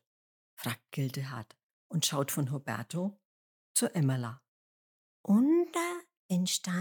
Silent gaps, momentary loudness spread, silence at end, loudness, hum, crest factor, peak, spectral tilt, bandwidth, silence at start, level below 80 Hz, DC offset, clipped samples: 1.63-1.90 s, 3.25-3.75 s, 4.48-5.24 s, 6.17-6.29 s; 14 LU; 0 s; -32 LUFS; none; 20 dB; -14 dBFS; -4.5 dB/octave; 19 kHz; 0.6 s; -88 dBFS; under 0.1%; under 0.1%